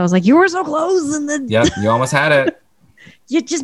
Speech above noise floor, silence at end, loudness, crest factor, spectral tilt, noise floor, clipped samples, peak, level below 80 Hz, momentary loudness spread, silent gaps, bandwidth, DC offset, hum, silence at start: 32 dB; 0 s; -15 LUFS; 12 dB; -5 dB/octave; -47 dBFS; under 0.1%; -2 dBFS; -44 dBFS; 8 LU; none; 12.5 kHz; 0.2%; none; 0 s